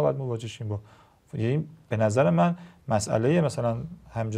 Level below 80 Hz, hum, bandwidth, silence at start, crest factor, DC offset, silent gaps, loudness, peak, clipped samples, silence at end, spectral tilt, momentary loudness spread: -58 dBFS; none; 12.5 kHz; 0 s; 18 dB; under 0.1%; none; -27 LUFS; -8 dBFS; under 0.1%; 0 s; -7 dB/octave; 13 LU